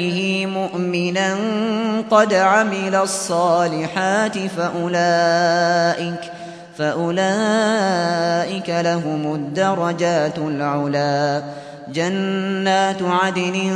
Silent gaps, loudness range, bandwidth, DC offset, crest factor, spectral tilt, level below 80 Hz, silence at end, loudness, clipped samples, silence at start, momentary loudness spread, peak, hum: none; 3 LU; 11 kHz; under 0.1%; 18 dB; -5 dB/octave; -66 dBFS; 0 s; -19 LUFS; under 0.1%; 0 s; 7 LU; -2 dBFS; none